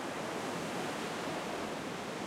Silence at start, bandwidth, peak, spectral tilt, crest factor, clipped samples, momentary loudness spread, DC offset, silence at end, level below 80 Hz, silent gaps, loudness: 0 s; 16 kHz; -26 dBFS; -4 dB/octave; 12 dB; under 0.1%; 2 LU; under 0.1%; 0 s; -70 dBFS; none; -38 LUFS